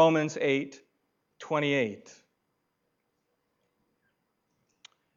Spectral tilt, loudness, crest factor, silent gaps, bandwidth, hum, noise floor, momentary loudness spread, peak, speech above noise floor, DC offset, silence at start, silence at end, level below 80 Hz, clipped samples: -5.5 dB/octave; -28 LUFS; 22 dB; none; 7.6 kHz; none; -78 dBFS; 19 LU; -10 dBFS; 51 dB; under 0.1%; 0 s; 3.2 s; -86 dBFS; under 0.1%